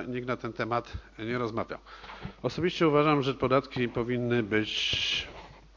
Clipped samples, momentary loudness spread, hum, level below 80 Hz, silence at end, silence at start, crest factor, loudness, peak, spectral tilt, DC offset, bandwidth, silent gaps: under 0.1%; 18 LU; none; -52 dBFS; 0.15 s; 0 s; 18 dB; -29 LUFS; -10 dBFS; -5.5 dB/octave; under 0.1%; 7.6 kHz; none